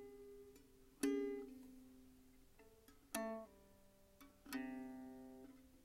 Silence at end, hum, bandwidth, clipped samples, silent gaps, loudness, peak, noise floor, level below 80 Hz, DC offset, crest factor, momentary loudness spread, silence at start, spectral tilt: 0 s; none; 16 kHz; under 0.1%; none; -48 LUFS; -26 dBFS; -69 dBFS; -74 dBFS; under 0.1%; 24 dB; 25 LU; 0 s; -4 dB/octave